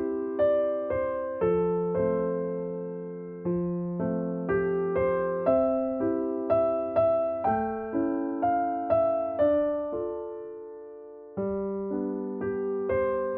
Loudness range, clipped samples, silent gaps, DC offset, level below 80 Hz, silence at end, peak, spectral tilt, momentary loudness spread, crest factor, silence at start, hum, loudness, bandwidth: 4 LU; under 0.1%; none; under 0.1%; -56 dBFS; 0 s; -12 dBFS; -8.5 dB/octave; 11 LU; 16 dB; 0 s; none; -28 LUFS; 4.3 kHz